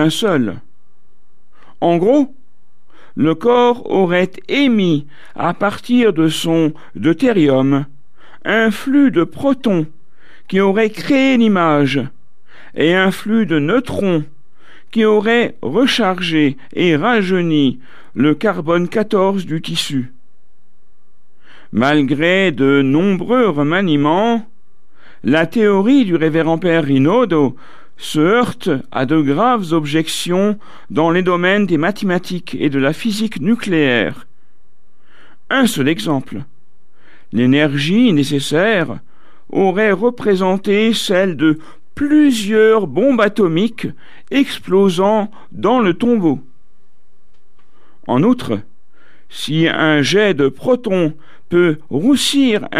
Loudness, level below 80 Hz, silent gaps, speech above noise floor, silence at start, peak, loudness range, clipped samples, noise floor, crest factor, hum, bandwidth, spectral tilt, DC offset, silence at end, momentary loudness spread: -15 LUFS; -54 dBFS; none; 48 dB; 0 s; 0 dBFS; 4 LU; under 0.1%; -62 dBFS; 14 dB; none; 14.5 kHz; -6 dB/octave; 3%; 0 s; 9 LU